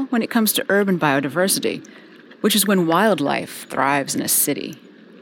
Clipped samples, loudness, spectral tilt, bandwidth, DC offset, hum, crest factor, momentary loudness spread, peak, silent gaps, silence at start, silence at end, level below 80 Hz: under 0.1%; -19 LUFS; -3.5 dB/octave; 19 kHz; under 0.1%; none; 16 dB; 10 LU; -4 dBFS; none; 0 s; 0.45 s; -72 dBFS